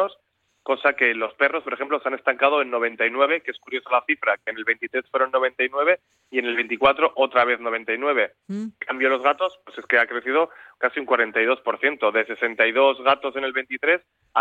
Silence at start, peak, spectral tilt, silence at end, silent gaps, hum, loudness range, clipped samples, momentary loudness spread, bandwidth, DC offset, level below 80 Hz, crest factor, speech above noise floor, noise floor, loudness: 0 s; -4 dBFS; -5.5 dB/octave; 0 s; none; none; 2 LU; under 0.1%; 8 LU; 7 kHz; under 0.1%; -68 dBFS; 18 dB; 45 dB; -68 dBFS; -22 LUFS